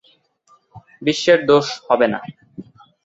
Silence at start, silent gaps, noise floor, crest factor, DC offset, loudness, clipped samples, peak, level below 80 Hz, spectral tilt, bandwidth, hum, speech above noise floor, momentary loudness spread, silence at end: 0.75 s; none; -58 dBFS; 18 dB; under 0.1%; -17 LUFS; under 0.1%; -2 dBFS; -60 dBFS; -4.5 dB/octave; 8 kHz; none; 41 dB; 24 LU; 0.45 s